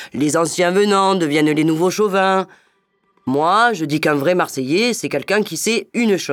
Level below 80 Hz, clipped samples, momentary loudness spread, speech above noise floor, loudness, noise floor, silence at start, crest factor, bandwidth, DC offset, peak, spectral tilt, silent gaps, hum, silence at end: -66 dBFS; under 0.1%; 5 LU; 46 dB; -17 LUFS; -63 dBFS; 0 s; 16 dB; 18.5 kHz; under 0.1%; -2 dBFS; -4.5 dB/octave; none; none; 0 s